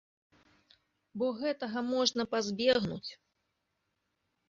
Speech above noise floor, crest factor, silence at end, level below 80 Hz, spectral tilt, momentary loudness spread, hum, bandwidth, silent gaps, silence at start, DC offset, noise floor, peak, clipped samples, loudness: 50 dB; 22 dB; 1.35 s; -68 dBFS; -3 dB/octave; 13 LU; none; 7.6 kHz; none; 1.15 s; under 0.1%; -82 dBFS; -14 dBFS; under 0.1%; -32 LUFS